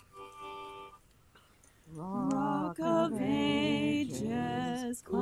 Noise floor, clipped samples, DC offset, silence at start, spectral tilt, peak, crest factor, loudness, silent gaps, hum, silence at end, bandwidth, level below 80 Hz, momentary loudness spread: -62 dBFS; under 0.1%; under 0.1%; 0.15 s; -5.5 dB/octave; -18 dBFS; 16 dB; -32 LUFS; none; none; 0 s; 14.5 kHz; -64 dBFS; 17 LU